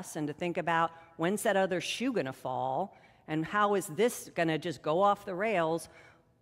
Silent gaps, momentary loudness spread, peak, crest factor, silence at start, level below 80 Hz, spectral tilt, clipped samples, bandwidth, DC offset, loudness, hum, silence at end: none; 8 LU; -14 dBFS; 18 dB; 0 s; -72 dBFS; -4.5 dB/octave; under 0.1%; 16 kHz; under 0.1%; -31 LUFS; none; 0.4 s